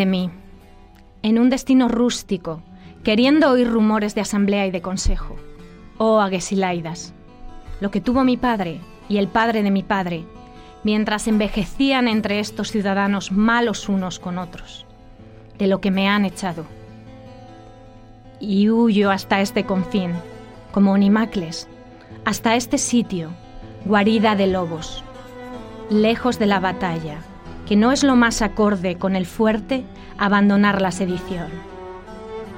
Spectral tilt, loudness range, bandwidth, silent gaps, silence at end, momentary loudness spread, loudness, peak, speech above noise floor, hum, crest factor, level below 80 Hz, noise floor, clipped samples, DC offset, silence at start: -5.5 dB/octave; 4 LU; 16.5 kHz; none; 0 s; 19 LU; -19 LUFS; -2 dBFS; 27 dB; none; 18 dB; -38 dBFS; -45 dBFS; under 0.1%; under 0.1%; 0 s